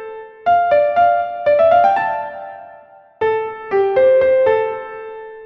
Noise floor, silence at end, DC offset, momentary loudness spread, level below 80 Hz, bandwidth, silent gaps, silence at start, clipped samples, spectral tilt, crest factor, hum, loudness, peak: -43 dBFS; 0 s; under 0.1%; 18 LU; -56 dBFS; 6 kHz; none; 0 s; under 0.1%; -6.5 dB/octave; 14 dB; none; -15 LUFS; -2 dBFS